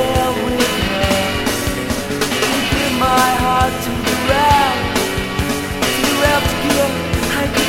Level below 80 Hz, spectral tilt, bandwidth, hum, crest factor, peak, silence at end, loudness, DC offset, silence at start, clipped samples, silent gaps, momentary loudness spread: -30 dBFS; -4 dB/octave; 16.5 kHz; none; 16 dB; 0 dBFS; 0 s; -16 LUFS; under 0.1%; 0 s; under 0.1%; none; 6 LU